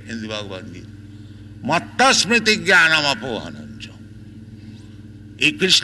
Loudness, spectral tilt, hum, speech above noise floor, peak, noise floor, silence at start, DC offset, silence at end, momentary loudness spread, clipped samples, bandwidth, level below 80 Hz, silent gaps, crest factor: -16 LUFS; -2.5 dB/octave; none; 21 dB; -4 dBFS; -39 dBFS; 0 s; under 0.1%; 0 s; 24 LU; under 0.1%; 12 kHz; -52 dBFS; none; 16 dB